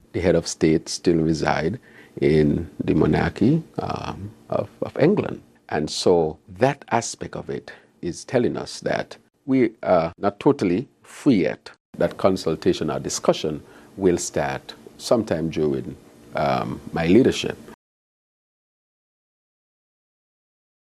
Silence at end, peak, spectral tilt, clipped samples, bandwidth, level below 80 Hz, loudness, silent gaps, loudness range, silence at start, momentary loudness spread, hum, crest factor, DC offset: 3.2 s; 0 dBFS; -5.5 dB/octave; under 0.1%; 13 kHz; -48 dBFS; -22 LUFS; 11.80-11.93 s; 4 LU; 0.15 s; 14 LU; none; 22 dB; under 0.1%